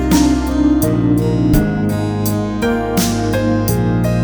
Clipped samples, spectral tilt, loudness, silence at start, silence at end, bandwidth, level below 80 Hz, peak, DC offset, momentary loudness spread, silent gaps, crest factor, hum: under 0.1%; -6 dB/octave; -15 LUFS; 0 s; 0 s; over 20 kHz; -26 dBFS; -2 dBFS; under 0.1%; 4 LU; none; 12 dB; none